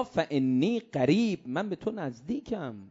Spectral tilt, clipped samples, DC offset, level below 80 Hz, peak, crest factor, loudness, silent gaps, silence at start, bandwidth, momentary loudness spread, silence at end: -7 dB/octave; under 0.1%; under 0.1%; -64 dBFS; -12 dBFS; 18 dB; -29 LUFS; none; 0 s; 7.8 kHz; 11 LU; 0 s